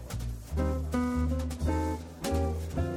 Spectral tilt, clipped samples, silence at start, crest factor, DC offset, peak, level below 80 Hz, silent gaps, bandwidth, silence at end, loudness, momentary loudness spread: -7 dB/octave; under 0.1%; 0 s; 14 dB; under 0.1%; -16 dBFS; -36 dBFS; none; 16 kHz; 0 s; -32 LUFS; 6 LU